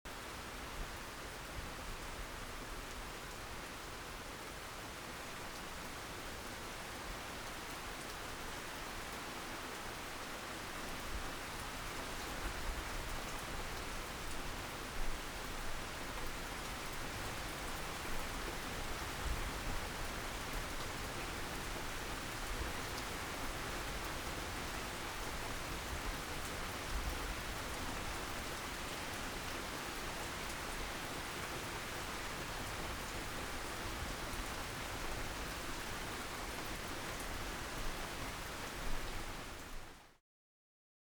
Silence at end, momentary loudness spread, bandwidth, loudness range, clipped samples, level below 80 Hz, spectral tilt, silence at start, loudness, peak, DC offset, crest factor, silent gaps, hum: 0.95 s; 4 LU; over 20 kHz; 4 LU; under 0.1%; -48 dBFS; -3 dB/octave; 0.05 s; -43 LUFS; -26 dBFS; under 0.1%; 16 dB; none; none